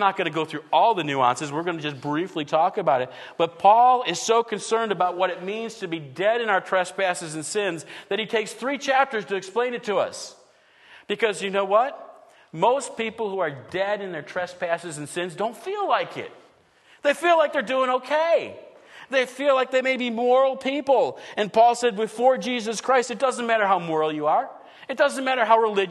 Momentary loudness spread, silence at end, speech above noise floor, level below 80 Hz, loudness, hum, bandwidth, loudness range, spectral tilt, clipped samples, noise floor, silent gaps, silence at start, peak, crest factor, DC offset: 11 LU; 0 s; 34 dB; -76 dBFS; -23 LUFS; none; 12.5 kHz; 5 LU; -3.5 dB/octave; under 0.1%; -56 dBFS; none; 0 s; -4 dBFS; 20 dB; under 0.1%